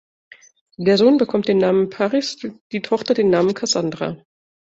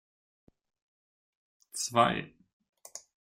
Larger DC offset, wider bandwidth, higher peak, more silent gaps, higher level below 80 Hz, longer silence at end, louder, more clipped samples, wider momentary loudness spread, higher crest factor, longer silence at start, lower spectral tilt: neither; second, 8 kHz vs 16 kHz; first, -2 dBFS vs -10 dBFS; about the same, 2.61-2.70 s vs 2.53-2.60 s, 2.69-2.73 s; first, -62 dBFS vs -68 dBFS; first, 0.6 s vs 0.4 s; first, -18 LUFS vs -29 LUFS; neither; second, 13 LU vs 22 LU; second, 16 dB vs 26 dB; second, 0.8 s vs 1.75 s; first, -5 dB/octave vs -3.5 dB/octave